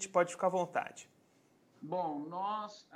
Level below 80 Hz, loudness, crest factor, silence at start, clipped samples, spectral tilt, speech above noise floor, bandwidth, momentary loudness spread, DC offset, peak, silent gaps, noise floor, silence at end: -88 dBFS; -36 LUFS; 22 dB; 0 s; under 0.1%; -4.5 dB/octave; 33 dB; 11 kHz; 14 LU; under 0.1%; -16 dBFS; none; -69 dBFS; 0 s